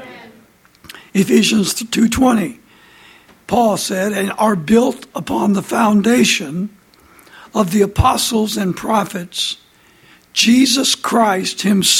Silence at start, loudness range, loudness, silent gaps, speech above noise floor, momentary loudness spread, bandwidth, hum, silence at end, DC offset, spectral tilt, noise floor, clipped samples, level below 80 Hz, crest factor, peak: 0 s; 3 LU; -15 LUFS; none; 34 dB; 10 LU; 16.5 kHz; none; 0 s; under 0.1%; -4 dB/octave; -49 dBFS; under 0.1%; -40 dBFS; 16 dB; 0 dBFS